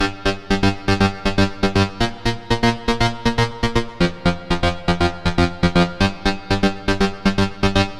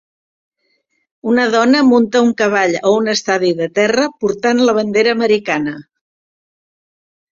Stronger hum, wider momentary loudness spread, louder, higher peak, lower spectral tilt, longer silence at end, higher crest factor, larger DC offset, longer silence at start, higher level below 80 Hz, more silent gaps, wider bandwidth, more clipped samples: neither; second, 4 LU vs 7 LU; second, -19 LUFS vs -14 LUFS; about the same, -2 dBFS vs 0 dBFS; first, -5.5 dB/octave vs -4 dB/octave; second, 0 s vs 1.55 s; about the same, 18 dB vs 14 dB; neither; second, 0 s vs 1.25 s; first, -30 dBFS vs -58 dBFS; neither; first, 13 kHz vs 7.6 kHz; neither